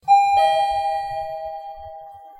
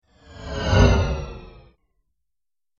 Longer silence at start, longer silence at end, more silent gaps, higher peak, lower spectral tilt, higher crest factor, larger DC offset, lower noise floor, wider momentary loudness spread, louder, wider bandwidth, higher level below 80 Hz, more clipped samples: second, 0.05 s vs 0.3 s; second, 0.05 s vs 1.35 s; neither; second, -6 dBFS vs -2 dBFS; second, -1.5 dB/octave vs -6 dB/octave; second, 14 dB vs 20 dB; neither; second, -39 dBFS vs under -90 dBFS; about the same, 22 LU vs 23 LU; about the same, -20 LUFS vs -20 LUFS; first, 11.5 kHz vs 7.2 kHz; second, -52 dBFS vs -28 dBFS; neither